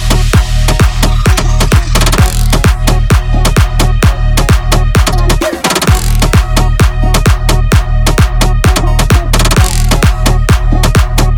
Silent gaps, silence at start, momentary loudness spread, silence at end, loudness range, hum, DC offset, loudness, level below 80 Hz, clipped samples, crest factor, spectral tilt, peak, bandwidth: none; 0 s; 2 LU; 0 s; 0 LU; none; 0.2%; -10 LUFS; -10 dBFS; 0.8%; 8 dB; -4.5 dB/octave; 0 dBFS; 18.5 kHz